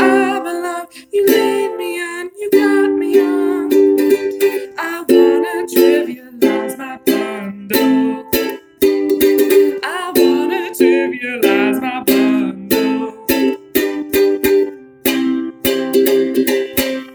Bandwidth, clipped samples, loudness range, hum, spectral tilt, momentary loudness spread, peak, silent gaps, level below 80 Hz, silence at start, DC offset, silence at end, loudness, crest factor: over 20 kHz; under 0.1%; 2 LU; none; -4 dB/octave; 9 LU; 0 dBFS; none; -50 dBFS; 0 s; under 0.1%; 0 s; -15 LUFS; 14 dB